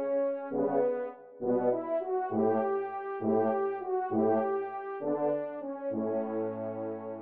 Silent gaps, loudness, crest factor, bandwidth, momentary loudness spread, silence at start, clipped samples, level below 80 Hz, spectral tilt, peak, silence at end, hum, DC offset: none; -32 LUFS; 14 dB; 3.7 kHz; 8 LU; 0 s; under 0.1%; -82 dBFS; -8 dB/octave; -16 dBFS; 0 s; none; under 0.1%